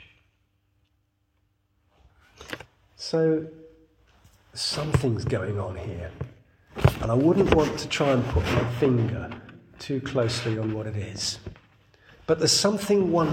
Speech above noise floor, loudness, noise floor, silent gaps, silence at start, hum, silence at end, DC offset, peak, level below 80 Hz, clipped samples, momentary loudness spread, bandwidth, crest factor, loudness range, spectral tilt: 46 dB; -25 LUFS; -71 dBFS; none; 2.4 s; none; 0 s; under 0.1%; -4 dBFS; -42 dBFS; under 0.1%; 19 LU; 17 kHz; 24 dB; 8 LU; -5 dB/octave